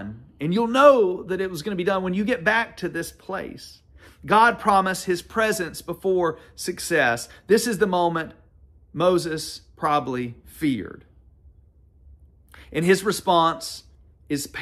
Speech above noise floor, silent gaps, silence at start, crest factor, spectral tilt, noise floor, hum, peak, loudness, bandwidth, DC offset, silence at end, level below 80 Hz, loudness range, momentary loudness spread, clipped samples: 32 dB; none; 0 s; 20 dB; -4.5 dB/octave; -54 dBFS; none; -2 dBFS; -22 LUFS; 15 kHz; under 0.1%; 0 s; -54 dBFS; 6 LU; 15 LU; under 0.1%